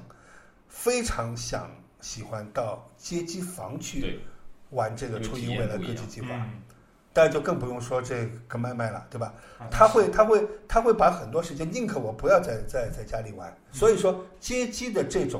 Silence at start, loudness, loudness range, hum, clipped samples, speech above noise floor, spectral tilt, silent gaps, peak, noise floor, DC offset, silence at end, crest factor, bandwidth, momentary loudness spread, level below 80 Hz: 0 s; -27 LUFS; 10 LU; none; under 0.1%; 27 dB; -5 dB/octave; none; -2 dBFS; -53 dBFS; under 0.1%; 0 s; 24 dB; 16 kHz; 16 LU; -44 dBFS